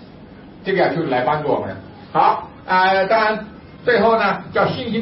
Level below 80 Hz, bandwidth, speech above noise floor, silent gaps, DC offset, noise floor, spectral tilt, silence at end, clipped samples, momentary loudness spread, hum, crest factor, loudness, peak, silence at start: -52 dBFS; 5.8 kHz; 23 dB; none; under 0.1%; -40 dBFS; -10 dB/octave; 0 s; under 0.1%; 12 LU; none; 14 dB; -18 LUFS; -4 dBFS; 0 s